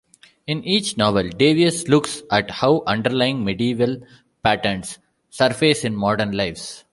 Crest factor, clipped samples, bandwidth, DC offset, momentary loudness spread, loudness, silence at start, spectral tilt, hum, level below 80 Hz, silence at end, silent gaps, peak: 18 dB; under 0.1%; 11.5 kHz; under 0.1%; 12 LU; -20 LUFS; 0.5 s; -4.5 dB/octave; none; -50 dBFS; 0.15 s; none; -2 dBFS